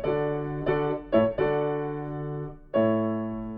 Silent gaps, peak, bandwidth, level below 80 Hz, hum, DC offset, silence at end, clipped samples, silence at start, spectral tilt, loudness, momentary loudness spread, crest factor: none; -10 dBFS; 5.2 kHz; -48 dBFS; none; under 0.1%; 0 s; under 0.1%; 0 s; -10.5 dB/octave; -27 LUFS; 9 LU; 18 dB